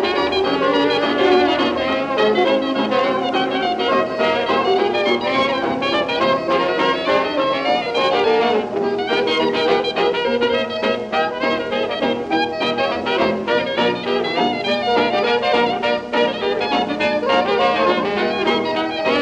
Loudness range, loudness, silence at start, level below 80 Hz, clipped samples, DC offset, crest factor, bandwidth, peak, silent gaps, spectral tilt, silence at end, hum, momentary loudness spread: 2 LU; -18 LUFS; 0 s; -52 dBFS; under 0.1%; under 0.1%; 14 dB; 9.4 kHz; -4 dBFS; none; -5 dB/octave; 0 s; none; 4 LU